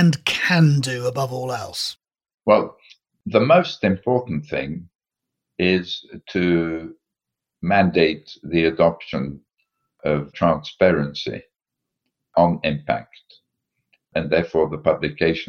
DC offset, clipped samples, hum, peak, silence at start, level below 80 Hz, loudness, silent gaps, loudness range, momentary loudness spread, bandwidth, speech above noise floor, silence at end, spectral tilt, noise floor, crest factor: under 0.1%; under 0.1%; none; -2 dBFS; 0 s; -50 dBFS; -21 LUFS; 2.34-2.38 s; 3 LU; 14 LU; 15.5 kHz; 65 dB; 0 s; -6 dB/octave; -85 dBFS; 18 dB